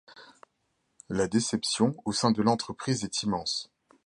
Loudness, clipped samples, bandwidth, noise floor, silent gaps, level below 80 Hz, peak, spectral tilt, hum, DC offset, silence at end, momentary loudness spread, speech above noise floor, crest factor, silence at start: -28 LUFS; under 0.1%; 11.5 kHz; -76 dBFS; none; -60 dBFS; -10 dBFS; -4.5 dB/octave; none; under 0.1%; 0.4 s; 7 LU; 48 dB; 20 dB; 0.1 s